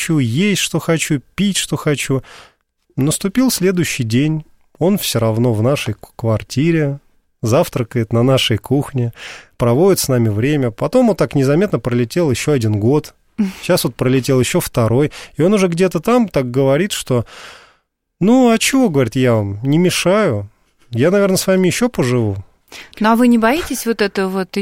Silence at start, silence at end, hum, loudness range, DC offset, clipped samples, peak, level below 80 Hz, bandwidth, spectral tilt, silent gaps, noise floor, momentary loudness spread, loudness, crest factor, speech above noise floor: 0 s; 0 s; none; 3 LU; 0.2%; under 0.1%; -2 dBFS; -44 dBFS; 16.5 kHz; -5.5 dB/octave; none; -60 dBFS; 9 LU; -16 LUFS; 14 dB; 45 dB